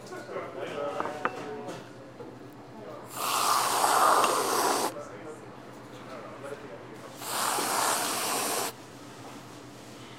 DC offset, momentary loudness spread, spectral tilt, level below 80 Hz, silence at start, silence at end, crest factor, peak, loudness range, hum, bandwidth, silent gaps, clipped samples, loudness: under 0.1%; 21 LU; -1.5 dB/octave; -72 dBFS; 0 s; 0 s; 22 dB; -8 dBFS; 7 LU; none; 16 kHz; none; under 0.1%; -28 LUFS